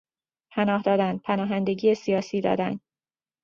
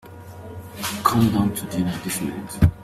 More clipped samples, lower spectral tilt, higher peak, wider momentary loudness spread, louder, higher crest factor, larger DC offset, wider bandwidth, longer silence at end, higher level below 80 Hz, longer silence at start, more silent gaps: neither; first, -7 dB/octave vs -5.5 dB/octave; second, -8 dBFS vs -2 dBFS; second, 6 LU vs 19 LU; about the same, -25 LUFS vs -23 LUFS; about the same, 18 dB vs 20 dB; neither; second, 7.2 kHz vs 16 kHz; first, 0.65 s vs 0 s; second, -66 dBFS vs -38 dBFS; first, 0.55 s vs 0.05 s; neither